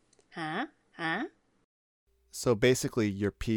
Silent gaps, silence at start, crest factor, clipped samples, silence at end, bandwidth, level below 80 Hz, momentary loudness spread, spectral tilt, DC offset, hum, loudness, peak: 1.64-2.07 s; 0.35 s; 20 dB; under 0.1%; 0 s; 19 kHz; -54 dBFS; 16 LU; -5 dB/octave; under 0.1%; none; -31 LUFS; -12 dBFS